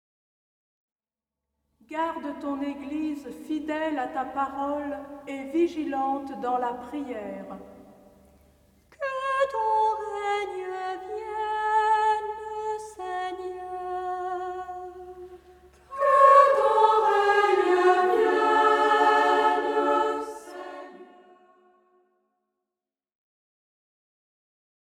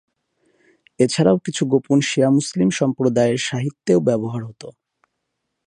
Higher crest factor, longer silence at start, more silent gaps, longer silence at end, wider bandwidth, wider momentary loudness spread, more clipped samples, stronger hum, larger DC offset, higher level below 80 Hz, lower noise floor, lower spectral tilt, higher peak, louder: about the same, 22 dB vs 18 dB; first, 1.9 s vs 1 s; neither; first, 3.95 s vs 0.95 s; first, 14 kHz vs 10.5 kHz; first, 18 LU vs 11 LU; neither; neither; neither; about the same, -64 dBFS vs -60 dBFS; first, under -90 dBFS vs -76 dBFS; second, -4 dB/octave vs -5.5 dB/octave; about the same, -4 dBFS vs -2 dBFS; second, -25 LUFS vs -19 LUFS